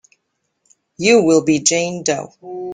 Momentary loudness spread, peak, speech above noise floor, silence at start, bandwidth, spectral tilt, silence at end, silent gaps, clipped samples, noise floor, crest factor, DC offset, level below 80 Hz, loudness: 14 LU; 0 dBFS; 56 dB; 1 s; 10 kHz; -3.5 dB/octave; 0 s; none; under 0.1%; -71 dBFS; 18 dB; under 0.1%; -58 dBFS; -15 LUFS